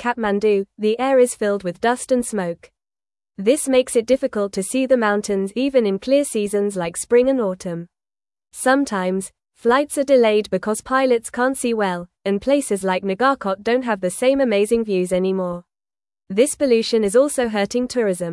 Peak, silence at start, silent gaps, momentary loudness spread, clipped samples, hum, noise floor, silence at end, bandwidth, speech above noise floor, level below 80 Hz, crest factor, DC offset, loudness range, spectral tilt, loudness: -4 dBFS; 0 s; none; 8 LU; under 0.1%; none; under -90 dBFS; 0 s; 12 kHz; over 71 dB; -56 dBFS; 16 dB; under 0.1%; 2 LU; -4.5 dB/octave; -19 LUFS